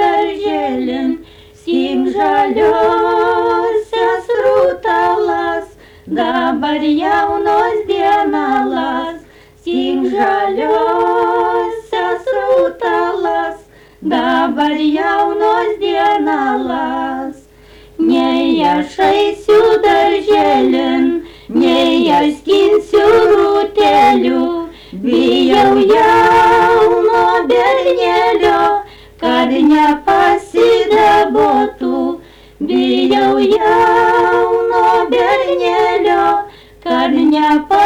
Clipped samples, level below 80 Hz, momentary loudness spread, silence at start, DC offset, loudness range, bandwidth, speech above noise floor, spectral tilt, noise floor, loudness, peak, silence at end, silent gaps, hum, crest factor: under 0.1%; -44 dBFS; 9 LU; 0 s; under 0.1%; 5 LU; 14.5 kHz; 30 dB; -5 dB/octave; -41 dBFS; -12 LUFS; -4 dBFS; 0 s; none; none; 10 dB